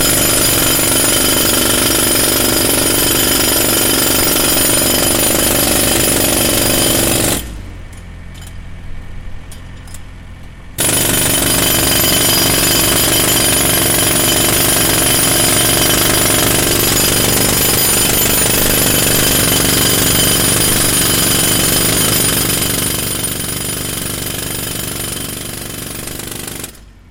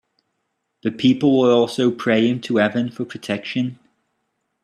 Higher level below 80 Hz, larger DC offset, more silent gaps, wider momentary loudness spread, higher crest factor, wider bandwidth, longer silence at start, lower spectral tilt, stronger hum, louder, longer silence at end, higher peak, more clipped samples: first, -30 dBFS vs -64 dBFS; neither; neither; second, 9 LU vs 12 LU; about the same, 14 dB vs 16 dB; first, 17 kHz vs 10.5 kHz; second, 0 s vs 0.85 s; second, -2 dB/octave vs -6.5 dB/octave; neither; first, -10 LUFS vs -19 LUFS; second, 0.2 s vs 0.9 s; first, 0 dBFS vs -4 dBFS; neither